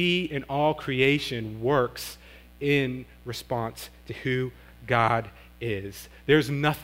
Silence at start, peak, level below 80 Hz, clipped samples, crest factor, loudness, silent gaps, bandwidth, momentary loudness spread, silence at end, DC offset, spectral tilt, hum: 0 s; -6 dBFS; -52 dBFS; under 0.1%; 22 dB; -26 LUFS; none; 16 kHz; 15 LU; 0 s; under 0.1%; -5.5 dB/octave; none